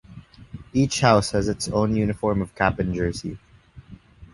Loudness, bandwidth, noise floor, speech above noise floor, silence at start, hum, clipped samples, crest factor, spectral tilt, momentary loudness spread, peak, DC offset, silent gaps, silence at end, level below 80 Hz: -22 LUFS; 11.5 kHz; -46 dBFS; 24 dB; 0.1 s; none; under 0.1%; 22 dB; -5.5 dB/octave; 17 LU; -2 dBFS; under 0.1%; none; 0.1 s; -42 dBFS